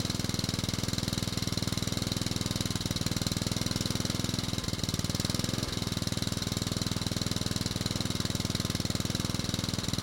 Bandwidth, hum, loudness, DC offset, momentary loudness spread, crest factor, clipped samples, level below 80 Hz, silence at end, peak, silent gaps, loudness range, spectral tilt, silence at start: 17 kHz; none; -31 LUFS; under 0.1%; 1 LU; 20 dB; under 0.1%; -46 dBFS; 0 s; -12 dBFS; none; 0 LU; -4 dB/octave; 0 s